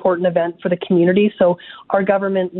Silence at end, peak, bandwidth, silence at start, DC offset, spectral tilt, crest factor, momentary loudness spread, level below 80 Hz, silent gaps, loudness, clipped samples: 0 s; 0 dBFS; 4.1 kHz; 0 s; under 0.1%; -12 dB/octave; 16 dB; 7 LU; -60 dBFS; none; -17 LUFS; under 0.1%